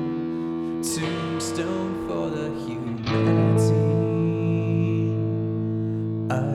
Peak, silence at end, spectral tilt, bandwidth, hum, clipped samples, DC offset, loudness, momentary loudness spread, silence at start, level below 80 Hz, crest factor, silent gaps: -8 dBFS; 0 s; -7 dB/octave; 13.5 kHz; none; under 0.1%; under 0.1%; -24 LUFS; 8 LU; 0 s; -54 dBFS; 14 dB; none